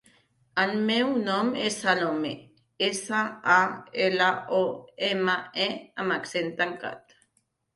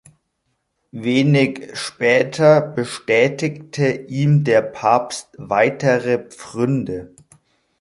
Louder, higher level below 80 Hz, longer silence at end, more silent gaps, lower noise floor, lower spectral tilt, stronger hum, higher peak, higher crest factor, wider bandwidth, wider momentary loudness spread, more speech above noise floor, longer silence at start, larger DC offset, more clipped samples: second, -26 LUFS vs -18 LUFS; second, -72 dBFS vs -58 dBFS; about the same, 0.75 s vs 0.75 s; neither; about the same, -73 dBFS vs -71 dBFS; second, -3.5 dB/octave vs -6 dB/octave; neither; second, -8 dBFS vs -2 dBFS; about the same, 20 dB vs 18 dB; about the same, 11.5 kHz vs 11.5 kHz; second, 9 LU vs 13 LU; second, 47 dB vs 54 dB; second, 0.55 s vs 0.95 s; neither; neither